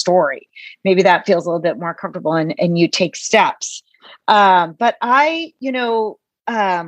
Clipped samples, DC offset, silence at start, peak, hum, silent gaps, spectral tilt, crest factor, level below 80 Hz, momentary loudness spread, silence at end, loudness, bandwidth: under 0.1%; under 0.1%; 0 s; 0 dBFS; none; none; -4.5 dB/octave; 16 dB; -70 dBFS; 13 LU; 0 s; -16 LUFS; 9.6 kHz